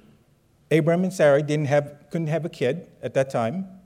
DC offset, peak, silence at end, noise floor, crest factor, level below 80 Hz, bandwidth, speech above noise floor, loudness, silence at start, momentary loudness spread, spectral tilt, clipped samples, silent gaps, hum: under 0.1%; -6 dBFS; 0.1 s; -60 dBFS; 16 dB; -66 dBFS; 14.5 kHz; 38 dB; -23 LUFS; 0.7 s; 9 LU; -7 dB/octave; under 0.1%; none; none